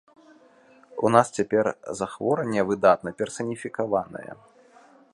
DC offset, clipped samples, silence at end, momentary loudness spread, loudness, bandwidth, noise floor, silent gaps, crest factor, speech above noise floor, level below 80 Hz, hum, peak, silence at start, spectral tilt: under 0.1%; under 0.1%; 0.8 s; 14 LU; -24 LUFS; 11.5 kHz; -55 dBFS; none; 24 dB; 31 dB; -64 dBFS; none; -2 dBFS; 0.95 s; -5.5 dB/octave